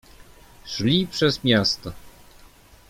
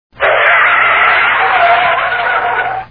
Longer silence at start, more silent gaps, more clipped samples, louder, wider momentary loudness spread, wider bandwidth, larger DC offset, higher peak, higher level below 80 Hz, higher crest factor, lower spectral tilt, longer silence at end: first, 0.65 s vs 0.15 s; neither; neither; second, -21 LUFS vs -9 LUFS; first, 17 LU vs 6 LU; first, 16.5 kHz vs 5.2 kHz; second, under 0.1% vs 0.3%; second, -4 dBFS vs 0 dBFS; about the same, -50 dBFS vs -46 dBFS; first, 22 dB vs 10 dB; about the same, -5 dB/octave vs -5 dB/octave; first, 0.8 s vs 0.05 s